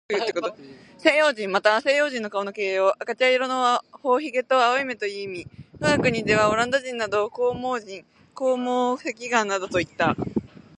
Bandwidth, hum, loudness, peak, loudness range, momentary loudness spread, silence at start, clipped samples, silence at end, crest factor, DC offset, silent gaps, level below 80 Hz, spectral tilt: 10.5 kHz; none; -23 LUFS; -2 dBFS; 3 LU; 10 LU; 0.1 s; under 0.1%; 0.2 s; 22 dB; under 0.1%; none; -56 dBFS; -4 dB/octave